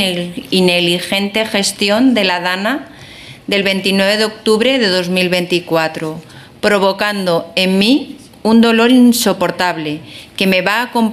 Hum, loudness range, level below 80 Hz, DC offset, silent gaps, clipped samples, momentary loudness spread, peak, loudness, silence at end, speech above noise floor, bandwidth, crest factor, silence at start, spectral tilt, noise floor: none; 2 LU; -54 dBFS; under 0.1%; none; under 0.1%; 13 LU; 0 dBFS; -13 LUFS; 0 s; 22 dB; 15 kHz; 12 dB; 0 s; -4 dB/octave; -35 dBFS